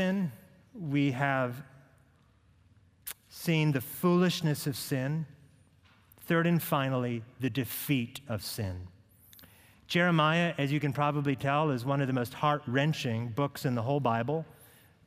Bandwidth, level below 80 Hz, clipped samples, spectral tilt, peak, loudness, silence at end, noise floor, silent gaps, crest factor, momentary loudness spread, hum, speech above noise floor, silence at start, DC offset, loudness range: 16 kHz; -68 dBFS; under 0.1%; -6 dB/octave; -12 dBFS; -30 LUFS; 0.55 s; -64 dBFS; none; 20 dB; 11 LU; none; 34 dB; 0 s; under 0.1%; 5 LU